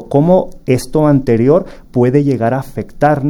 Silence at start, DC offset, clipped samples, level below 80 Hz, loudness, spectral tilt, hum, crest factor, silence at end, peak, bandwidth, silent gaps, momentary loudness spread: 0 s; under 0.1%; under 0.1%; -36 dBFS; -13 LUFS; -8 dB/octave; none; 12 dB; 0 s; 0 dBFS; 17 kHz; none; 6 LU